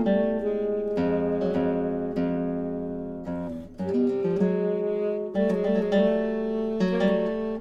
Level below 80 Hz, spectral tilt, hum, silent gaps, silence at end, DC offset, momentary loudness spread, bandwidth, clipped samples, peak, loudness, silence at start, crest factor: -50 dBFS; -8.5 dB/octave; none; none; 0 s; under 0.1%; 9 LU; 7.6 kHz; under 0.1%; -10 dBFS; -26 LUFS; 0 s; 14 dB